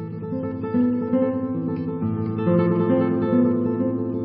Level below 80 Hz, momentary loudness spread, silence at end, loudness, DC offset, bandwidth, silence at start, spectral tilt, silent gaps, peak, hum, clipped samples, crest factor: -60 dBFS; 7 LU; 0 s; -22 LUFS; under 0.1%; 4.7 kHz; 0 s; -13.5 dB/octave; none; -6 dBFS; none; under 0.1%; 14 dB